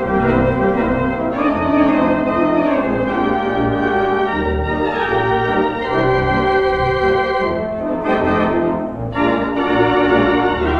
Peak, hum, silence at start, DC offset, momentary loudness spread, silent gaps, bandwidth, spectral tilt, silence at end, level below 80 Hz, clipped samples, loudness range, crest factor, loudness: 0 dBFS; none; 0 s; under 0.1%; 5 LU; none; 6.6 kHz; -8 dB/octave; 0 s; -34 dBFS; under 0.1%; 1 LU; 16 dB; -16 LUFS